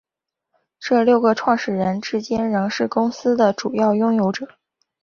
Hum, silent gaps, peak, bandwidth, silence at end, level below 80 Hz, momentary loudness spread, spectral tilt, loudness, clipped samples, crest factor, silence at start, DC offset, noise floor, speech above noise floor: none; none; -4 dBFS; 7 kHz; 0.55 s; -60 dBFS; 7 LU; -6 dB/octave; -19 LUFS; under 0.1%; 16 dB; 0.8 s; under 0.1%; -83 dBFS; 64 dB